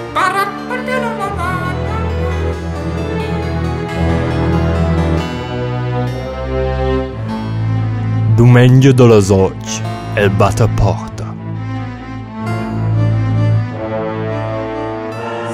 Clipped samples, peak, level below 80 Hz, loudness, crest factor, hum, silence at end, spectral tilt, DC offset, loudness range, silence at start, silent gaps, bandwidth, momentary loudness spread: under 0.1%; 0 dBFS; -28 dBFS; -15 LUFS; 14 dB; none; 0 s; -7 dB/octave; under 0.1%; 7 LU; 0 s; none; 13 kHz; 14 LU